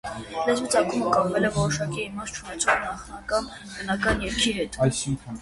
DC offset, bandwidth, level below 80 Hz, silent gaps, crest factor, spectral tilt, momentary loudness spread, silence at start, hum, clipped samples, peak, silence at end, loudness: under 0.1%; 11.5 kHz; -44 dBFS; none; 20 dB; -4 dB/octave; 11 LU; 0.05 s; none; under 0.1%; -6 dBFS; 0 s; -25 LUFS